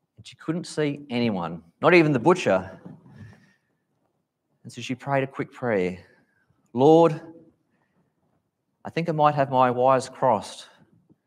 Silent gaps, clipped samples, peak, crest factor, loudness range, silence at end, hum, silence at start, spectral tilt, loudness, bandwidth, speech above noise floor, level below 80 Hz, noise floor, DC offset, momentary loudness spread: none; under 0.1%; -4 dBFS; 20 dB; 7 LU; 0.65 s; none; 0.2 s; -6.5 dB/octave; -22 LUFS; 11.5 kHz; 52 dB; -70 dBFS; -74 dBFS; under 0.1%; 19 LU